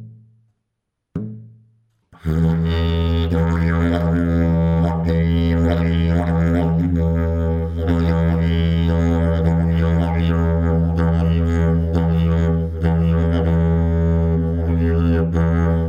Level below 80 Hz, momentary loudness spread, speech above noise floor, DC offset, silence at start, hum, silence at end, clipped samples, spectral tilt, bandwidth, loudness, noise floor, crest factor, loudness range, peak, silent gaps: -26 dBFS; 2 LU; 60 dB; under 0.1%; 0 s; none; 0 s; under 0.1%; -9.5 dB/octave; 7 kHz; -18 LUFS; -77 dBFS; 12 dB; 2 LU; -6 dBFS; none